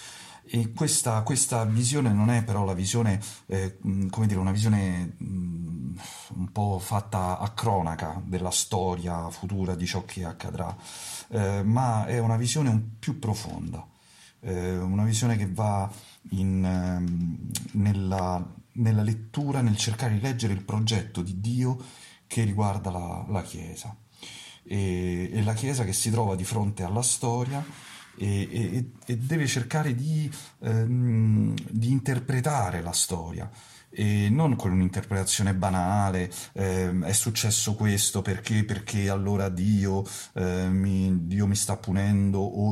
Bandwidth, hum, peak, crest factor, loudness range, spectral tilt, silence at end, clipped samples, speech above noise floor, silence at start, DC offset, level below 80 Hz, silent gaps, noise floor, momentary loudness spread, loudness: 14.5 kHz; none; -10 dBFS; 16 dB; 4 LU; -5 dB/octave; 0 s; under 0.1%; 29 dB; 0 s; under 0.1%; -52 dBFS; none; -56 dBFS; 11 LU; -27 LUFS